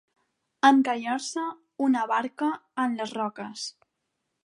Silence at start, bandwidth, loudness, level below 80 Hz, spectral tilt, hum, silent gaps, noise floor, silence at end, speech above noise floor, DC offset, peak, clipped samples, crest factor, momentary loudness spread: 0.65 s; 11.5 kHz; -26 LUFS; -82 dBFS; -3 dB/octave; none; none; -80 dBFS; 0.75 s; 55 dB; under 0.1%; -6 dBFS; under 0.1%; 22 dB; 15 LU